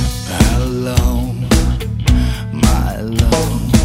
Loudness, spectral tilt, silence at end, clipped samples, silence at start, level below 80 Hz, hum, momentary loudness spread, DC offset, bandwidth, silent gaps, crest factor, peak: -16 LUFS; -5.5 dB/octave; 0 s; under 0.1%; 0 s; -18 dBFS; none; 5 LU; under 0.1%; 16.5 kHz; none; 14 dB; 0 dBFS